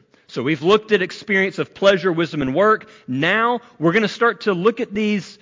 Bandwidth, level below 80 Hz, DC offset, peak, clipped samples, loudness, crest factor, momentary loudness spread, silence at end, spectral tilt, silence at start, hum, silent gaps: 7.6 kHz; -58 dBFS; under 0.1%; -4 dBFS; under 0.1%; -19 LUFS; 14 dB; 6 LU; 0.1 s; -6 dB/octave; 0.3 s; none; none